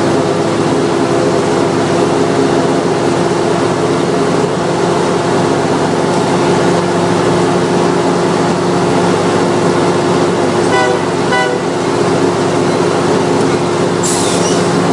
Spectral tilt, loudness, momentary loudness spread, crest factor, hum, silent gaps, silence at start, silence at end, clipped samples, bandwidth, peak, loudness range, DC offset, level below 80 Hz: -5 dB/octave; -12 LUFS; 1 LU; 12 dB; none; none; 0 s; 0 s; under 0.1%; 11.5 kHz; 0 dBFS; 1 LU; under 0.1%; -46 dBFS